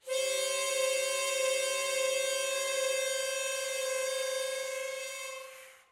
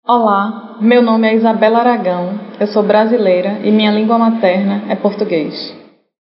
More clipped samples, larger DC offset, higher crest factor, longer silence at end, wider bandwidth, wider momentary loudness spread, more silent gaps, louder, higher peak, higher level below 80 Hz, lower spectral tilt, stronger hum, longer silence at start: neither; neither; about the same, 14 dB vs 12 dB; second, 0.15 s vs 0.45 s; first, 16 kHz vs 5.8 kHz; about the same, 9 LU vs 9 LU; neither; second, -31 LUFS vs -13 LUFS; second, -18 dBFS vs 0 dBFS; second, -86 dBFS vs -72 dBFS; second, 2.5 dB/octave vs -4.5 dB/octave; neither; about the same, 0.05 s vs 0.1 s